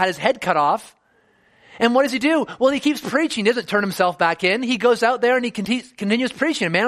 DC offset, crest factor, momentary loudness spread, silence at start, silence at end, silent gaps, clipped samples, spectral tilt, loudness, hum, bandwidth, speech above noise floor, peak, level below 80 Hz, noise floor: under 0.1%; 18 dB; 5 LU; 0 s; 0 s; none; under 0.1%; -4.5 dB/octave; -19 LUFS; none; 15 kHz; 41 dB; -2 dBFS; -62 dBFS; -60 dBFS